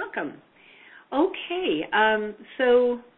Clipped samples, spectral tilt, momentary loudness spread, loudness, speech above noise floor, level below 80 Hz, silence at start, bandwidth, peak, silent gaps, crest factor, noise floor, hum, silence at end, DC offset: under 0.1%; -8.5 dB/octave; 12 LU; -24 LUFS; 27 dB; -64 dBFS; 0 s; 4.1 kHz; -8 dBFS; none; 16 dB; -51 dBFS; none; 0.15 s; under 0.1%